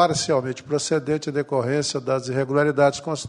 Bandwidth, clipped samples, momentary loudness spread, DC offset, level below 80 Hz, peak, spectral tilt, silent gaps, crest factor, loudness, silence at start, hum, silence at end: 11 kHz; under 0.1%; 6 LU; under 0.1%; -58 dBFS; -4 dBFS; -4.5 dB/octave; none; 18 dB; -22 LUFS; 0 s; none; 0 s